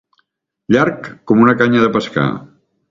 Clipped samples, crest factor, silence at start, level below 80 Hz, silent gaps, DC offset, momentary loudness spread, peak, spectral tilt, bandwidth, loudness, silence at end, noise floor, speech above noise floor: under 0.1%; 16 dB; 0.7 s; -52 dBFS; none; under 0.1%; 10 LU; 0 dBFS; -7 dB/octave; 7.4 kHz; -14 LUFS; 0.45 s; -65 dBFS; 52 dB